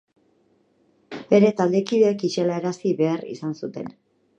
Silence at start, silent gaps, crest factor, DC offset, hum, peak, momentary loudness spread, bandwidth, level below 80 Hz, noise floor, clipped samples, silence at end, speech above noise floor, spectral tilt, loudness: 1.1 s; none; 20 dB; under 0.1%; none; -4 dBFS; 18 LU; 8.8 kHz; -72 dBFS; -63 dBFS; under 0.1%; 0.5 s; 42 dB; -6.5 dB/octave; -22 LUFS